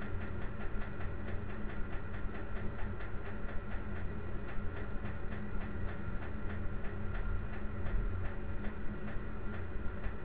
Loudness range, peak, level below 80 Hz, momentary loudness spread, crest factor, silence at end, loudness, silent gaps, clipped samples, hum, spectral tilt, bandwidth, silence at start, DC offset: 2 LU; -22 dBFS; -42 dBFS; 3 LU; 14 dB; 0 s; -43 LUFS; none; under 0.1%; none; -10 dB/octave; 4 kHz; 0 s; 1%